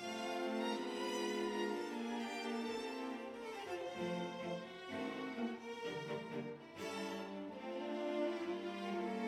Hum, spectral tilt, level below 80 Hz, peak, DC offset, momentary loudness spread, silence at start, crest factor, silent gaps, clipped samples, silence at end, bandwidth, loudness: none; -4.5 dB/octave; -82 dBFS; -26 dBFS; under 0.1%; 7 LU; 0 s; 16 dB; none; under 0.1%; 0 s; 15.5 kHz; -43 LUFS